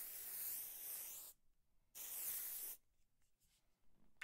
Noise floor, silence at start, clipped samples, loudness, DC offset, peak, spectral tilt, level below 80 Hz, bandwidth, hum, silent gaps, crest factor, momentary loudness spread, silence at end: -79 dBFS; 0 s; under 0.1%; -47 LUFS; under 0.1%; -32 dBFS; 1.5 dB/octave; -82 dBFS; 16 kHz; none; none; 20 dB; 12 LU; 0 s